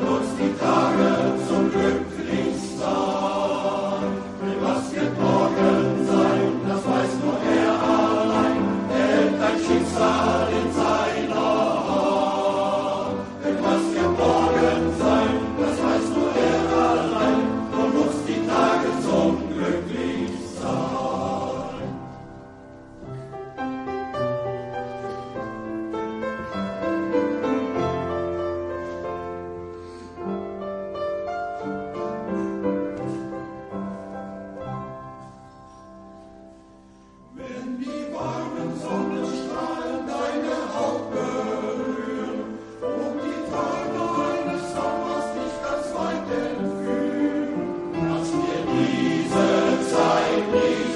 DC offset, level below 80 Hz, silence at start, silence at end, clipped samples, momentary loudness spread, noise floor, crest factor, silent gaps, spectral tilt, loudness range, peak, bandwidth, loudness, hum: under 0.1%; -54 dBFS; 0 s; 0 s; under 0.1%; 13 LU; -49 dBFS; 18 dB; none; -6 dB/octave; 10 LU; -6 dBFS; 11.5 kHz; -24 LUFS; none